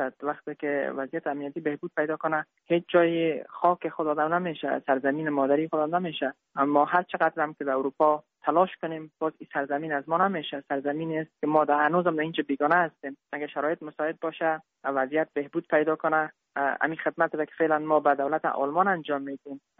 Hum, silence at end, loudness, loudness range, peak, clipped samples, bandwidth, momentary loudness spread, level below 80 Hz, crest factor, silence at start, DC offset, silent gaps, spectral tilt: none; 0.2 s; -27 LUFS; 2 LU; -8 dBFS; under 0.1%; 4.5 kHz; 9 LU; -78 dBFS; 20 dB; 0 s; under 0.1%; none; -4 dB/octave